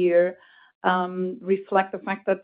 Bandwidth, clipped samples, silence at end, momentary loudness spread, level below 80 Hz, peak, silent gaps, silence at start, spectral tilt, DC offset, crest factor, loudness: 4.8 kHz; under 0.1%; 0.05 s; 7 LU; -76 dBFS; -6 dBFS; 0.75-0.81 s; 0 s; -10.5 dB/octave; under 0.1%; 18 dB; -25 LUFS